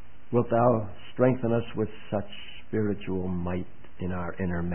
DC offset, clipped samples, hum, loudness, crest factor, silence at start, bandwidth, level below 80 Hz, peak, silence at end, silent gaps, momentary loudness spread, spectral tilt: 2%; under 0.1%; none; -29 LUFS; 18 dB; 0.3 s; 3.3 kHz; -52 dBFS; -10 dBFS; 0 s; none; 13 LU; -12 dB/octave